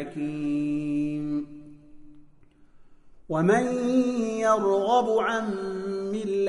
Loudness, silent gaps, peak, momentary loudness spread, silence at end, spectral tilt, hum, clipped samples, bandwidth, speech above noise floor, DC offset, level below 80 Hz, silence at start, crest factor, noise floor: -26 LUFS; none; -10 dBFS; 9 LU; 0 s; -6.5 dB/octave; none; under 0.1%; 10.5 kHz; 29 dB; under 0.1%; -58 dBFS; 0 s; 18 dB; -54 dBFS